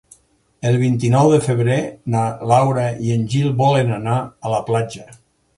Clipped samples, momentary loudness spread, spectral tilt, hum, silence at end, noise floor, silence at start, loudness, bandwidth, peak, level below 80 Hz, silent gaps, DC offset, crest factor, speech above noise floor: under 0.1%; 8 LU; -7 dB/octave; none; 0.45 s; -55 dBFS; 0.65 s; -18 LUFS; 11.5 kHz; 0 dBFS; -52 dBFS; none; under 0.1%; 18 dB; 39 dB